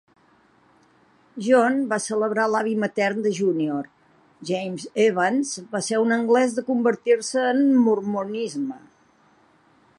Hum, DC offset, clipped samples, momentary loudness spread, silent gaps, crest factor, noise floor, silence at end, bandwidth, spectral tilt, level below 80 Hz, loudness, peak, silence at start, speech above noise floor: none; under 0.1%; under 0.1%; 11 LU; none; 18 dB; -59 dBFS; 1.2 s; 11.5 kHz; -4.5 dB/octave; -76 dBFS; -22 LUFS; -6 dBFS; 1.35 s; 37 dB